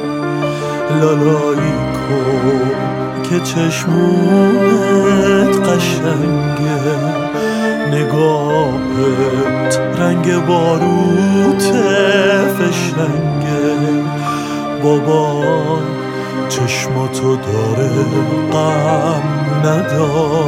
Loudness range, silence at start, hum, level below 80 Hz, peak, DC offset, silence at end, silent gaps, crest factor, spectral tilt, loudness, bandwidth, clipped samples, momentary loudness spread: 3 LU; 0 s; none; -44 dBFS; 0 dBFS; under 0.1%; 0 s; none; 12 dB; -6 dB/octave; -14 LUFS; 16.5 kHz; under 0.1%; 6 LU